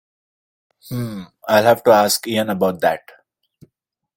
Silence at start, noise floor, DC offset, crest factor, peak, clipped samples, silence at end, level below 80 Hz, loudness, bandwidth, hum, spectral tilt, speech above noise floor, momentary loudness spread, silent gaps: 0.85 s; -74 dBFS; under 0.1%; 20 dB; 0 dBFS; under 0.1%; 1.2 s; -60 dBFS; -17 LUFS; 17 kHz; none; -4 dB/octave; 57 dB; 16 LU; none